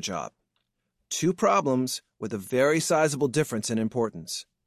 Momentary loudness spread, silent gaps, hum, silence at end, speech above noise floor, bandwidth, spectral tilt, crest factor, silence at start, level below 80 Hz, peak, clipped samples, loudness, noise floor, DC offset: 12 LU; none; none; 0.25 s; 52 dB; 14.5 kHz; -4.5 dB/octave; 16 dB; 0 s; -66 dBFS; -10 dBFS; under 0.1%; -26 LUFS; -78 dBFS; under 0.1%